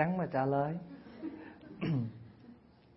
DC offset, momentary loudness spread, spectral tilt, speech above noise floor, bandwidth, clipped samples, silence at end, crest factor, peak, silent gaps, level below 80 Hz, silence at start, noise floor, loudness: under 0.1%; 21 LU; -7.5 dB/octave; 25 dB; 5.6 kHz; under 0.1%; 0.4 s; 22 dB; -16 dBFS; none; -68 dBFS; 0 s; -58 dBFS; -36 LUFS